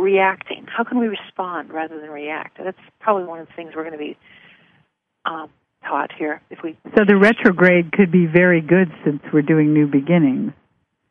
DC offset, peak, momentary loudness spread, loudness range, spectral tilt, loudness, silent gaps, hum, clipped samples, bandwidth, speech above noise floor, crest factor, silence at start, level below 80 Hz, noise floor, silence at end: under 0.1%; 0 dBFS; 18 LU; 13 LU; -9 dB/octave; -18 LUFS; none; none; under 0.1%; 6.2 kHz; 48 dB; 18 dB; 0 s; -60 dBFS; -66 dBFS; 0.6 s